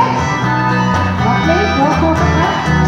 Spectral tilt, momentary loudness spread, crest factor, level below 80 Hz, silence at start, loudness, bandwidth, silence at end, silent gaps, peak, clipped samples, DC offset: -6 dB/octave; 2 LU; 12 dB; -28 dBFS; 0 s; -13 LUFS; 10 kHz; 0 s; none; 0 dBFS; under 0.1%; under 0.1%